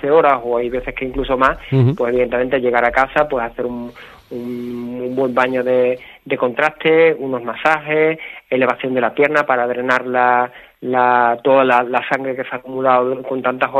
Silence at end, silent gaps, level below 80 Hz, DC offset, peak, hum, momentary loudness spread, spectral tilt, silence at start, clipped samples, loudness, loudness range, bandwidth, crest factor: 0 s; none; -44 dBFS; under 0.1%; 0 dBFS; none; 12 LU; -7.5 dB/octave; 0 s; under 0.1%; -17 LUFS; 4 LU; 13 kHz; 16 dB